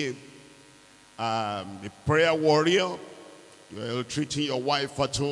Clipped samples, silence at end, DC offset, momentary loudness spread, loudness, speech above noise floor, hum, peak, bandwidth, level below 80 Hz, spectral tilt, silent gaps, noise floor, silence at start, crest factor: under 0.1%; 0 s; under 0.1%; 18 LU; -26 LUFS; 28 dB; none; -10 dBFS; 12 kHz; -58 dBFS; -4.5 dB/octave; none; -54 dBFS; 0 s; 18 dB